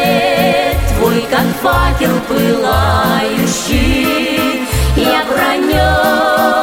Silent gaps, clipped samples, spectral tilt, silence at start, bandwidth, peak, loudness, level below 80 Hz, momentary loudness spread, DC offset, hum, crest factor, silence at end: none; under 0.1%; -5 dB/octave; 0 s; 16.5 kHz; 0 dBFS; -12 LUFS; -22 dBFS; 3 LU; under 0.1%; none; 12 dB; 0 s